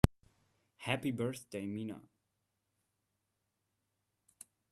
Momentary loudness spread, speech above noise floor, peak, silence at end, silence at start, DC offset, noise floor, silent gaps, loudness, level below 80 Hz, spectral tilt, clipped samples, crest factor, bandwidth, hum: 22 LU; 46 dB; -6 dBFS; 2.7 s; 0.05 s; under 0.1%; -85 dBFS; none; -39 LUFS; -50 dBFS; -6 dB/octave; under 0.1%; 34 dB; 14 kHz; none